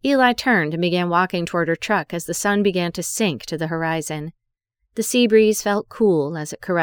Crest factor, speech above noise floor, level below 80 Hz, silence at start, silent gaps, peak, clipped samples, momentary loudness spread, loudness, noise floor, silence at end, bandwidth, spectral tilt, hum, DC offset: 18 dB; 55 dB; -56 dBFS; 0.05 s; none; -2 dBFS; under 0.1%; 11 LU; -20 LUFS; -75 dBFS; 0 s; over 20 kHz; -4.5 dB/octave; none; under 0.1%